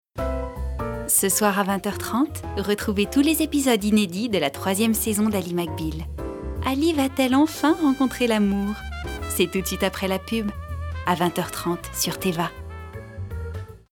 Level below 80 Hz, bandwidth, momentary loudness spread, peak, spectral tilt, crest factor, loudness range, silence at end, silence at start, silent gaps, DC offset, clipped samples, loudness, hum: -38 dBFS; 19.5 kHz; 13 LU; -4 dBFS; -4 dB/octave; 18 dB; 4 LU; 0.15 s; 0.15 s; none; under 0.1%; under 0.1%; -23 LUFS; none